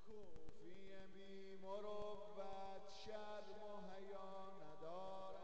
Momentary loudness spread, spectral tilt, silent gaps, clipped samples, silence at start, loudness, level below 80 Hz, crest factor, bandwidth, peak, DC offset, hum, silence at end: 9 LU; -5 dB/octave; none; under 0.1%; 0 s; -56 LUFS; -72 dBFS; 16 dB; 8.2 kHz; -38 dBFS; 0.3%; none; 0 s